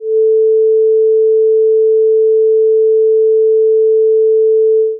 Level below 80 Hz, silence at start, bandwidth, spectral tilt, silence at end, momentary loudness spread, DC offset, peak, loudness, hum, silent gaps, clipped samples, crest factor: under -90 dBFS; 0 s; 0.5 kHz; -13 dB/octave; 0 s; 0 LU; under 0.1%; -6 dBFS; -10 LUFS; none; none; under 0.1%; 4 dB